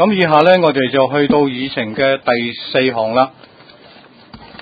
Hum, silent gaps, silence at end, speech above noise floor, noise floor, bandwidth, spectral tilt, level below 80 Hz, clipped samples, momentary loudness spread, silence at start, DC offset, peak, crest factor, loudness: none; none; 0.05 s; 29 dB; -42 dBFS; 5 kHz; -8 dB/octave; -52 dBFS; under 0.1%; 8 LU; 0 s; under 0.1%; 0 dBFS; 14 dB; -14 LUFS